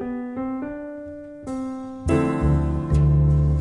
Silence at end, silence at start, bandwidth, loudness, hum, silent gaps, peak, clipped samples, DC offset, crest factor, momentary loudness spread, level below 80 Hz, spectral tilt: 0 s; 0 s; 10.5 kHz; -23 LUFS; none; none; -8 dBFS; under 0.1%; under 0.1%; 14 dB; 16 LU; -30 dBFS; -9.5 dB/octave